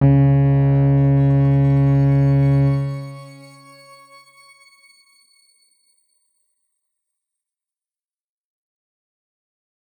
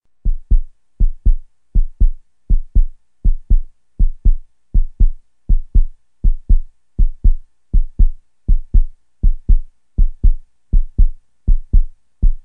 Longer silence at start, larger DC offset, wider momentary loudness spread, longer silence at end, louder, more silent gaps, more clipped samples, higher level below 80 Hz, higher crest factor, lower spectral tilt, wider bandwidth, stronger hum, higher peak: second, 0 s vs 0.25 s; second, under 0.1% vs 0.3%; first, 12 LU vs 9 LU; first, 6.7 s vs 0.05 s; first, -16 LUFS vs -22 LUFS; neither; neither; second, -40 dBFS vs -14 dBFS; about the same, 14 dB vs 12 dB; second, -10.5 dB/octave vs -12.5 dB/octave; first, 4.7 kHz vs 0.5 kHz; neither; second, -6 dBFS vs 0 dBFS